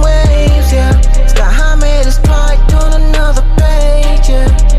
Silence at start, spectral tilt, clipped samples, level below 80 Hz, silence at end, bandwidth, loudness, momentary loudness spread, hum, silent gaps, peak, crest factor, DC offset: 0 s; -5.5 dB/octave; under 0.1%; -6 dBFS; 0 s; 12 kHz; -11 LUFS; 3 LU; none; none; 0 dBFS; 6 dB; 1%